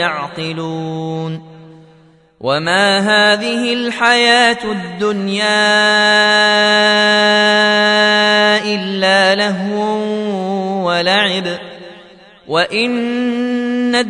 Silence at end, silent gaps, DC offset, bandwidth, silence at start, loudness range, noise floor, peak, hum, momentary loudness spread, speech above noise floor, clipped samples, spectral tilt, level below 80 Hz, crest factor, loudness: 0 s; none; under 0.1%; 11 kHz; 0 s; 7 LU; -47 dBFS; 0 dBFS; none; 12 LU; 33 dB; under 0.1%; -3.5 dB/octave; -60 dBFS; 14 dB; -13 LUFS